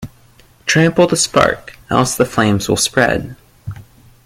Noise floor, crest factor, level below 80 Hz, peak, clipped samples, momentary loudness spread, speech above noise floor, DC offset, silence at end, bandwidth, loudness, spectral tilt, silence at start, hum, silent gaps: -48 dBFS; 16 dB; -42 dBFS; 0 dBFS; under 0.1%; 20 LU; 33 dB; under 0.1%; 0.45 s; 16.5 kHz; -14 LUFS; -4 dB/octave; 0 s; none; none